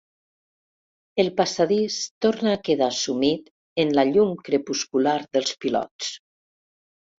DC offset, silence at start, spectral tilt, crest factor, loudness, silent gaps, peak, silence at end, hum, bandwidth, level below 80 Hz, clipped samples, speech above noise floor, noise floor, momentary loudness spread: under 0.1%; 1.15 s; -4 dB/octave; 18 dB; -23 LUFS; 2.11-2.21 s, 3.51-3.76 s, 5.91-5.99 s; -6 dBFS; 1.05 s; none; 7.8 kHz; -64 dBFS; under 0.1%; over 68 dB; under -90 dBFS; 10 LU